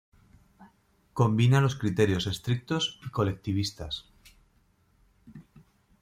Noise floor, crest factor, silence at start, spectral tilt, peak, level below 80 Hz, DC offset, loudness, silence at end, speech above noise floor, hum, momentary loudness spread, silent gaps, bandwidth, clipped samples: -66 dBFS; 20 dB; 0.6 s; -6 dB/octave; -10 dBFS; -56 dBFS; under 0.1%; -28 LUFS; 0.6 s; 40 dB; none; 14 LU; none; 15 kHz; under 0.1%